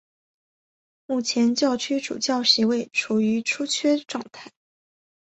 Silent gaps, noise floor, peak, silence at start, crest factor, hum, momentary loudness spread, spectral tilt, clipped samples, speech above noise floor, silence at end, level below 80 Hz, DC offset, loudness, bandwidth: none; under -90 dBFS; -4 dBFS; 1.1 s; 20 dB; none; 10 LU; -3 dB/octave; under 0.1%; over 67 dB; 0.75 s; -70 dBFS; under 0.1%; -22 LUFS; 8.4 kHz